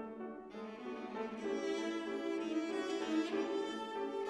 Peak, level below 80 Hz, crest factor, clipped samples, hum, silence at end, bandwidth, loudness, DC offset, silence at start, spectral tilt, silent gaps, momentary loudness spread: -24 dBFS; -78 dBFS; 16 dB; under 0.1%; none; 0 s; 11 kHz; -40 LUFS; under 0.1%; 0 s; -4.5 dB/octave; none; 10 LU